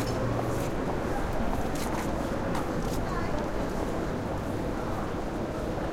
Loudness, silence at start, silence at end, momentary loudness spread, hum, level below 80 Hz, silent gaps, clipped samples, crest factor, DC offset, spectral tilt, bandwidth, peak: -31 LUFS; 0 s; 0 s; 3 LU; none; -38 dBFS; none; under 0.1%; 14 dB; under 0.1%; -6 dB/octave; 16.5 kHz; -16 dBFS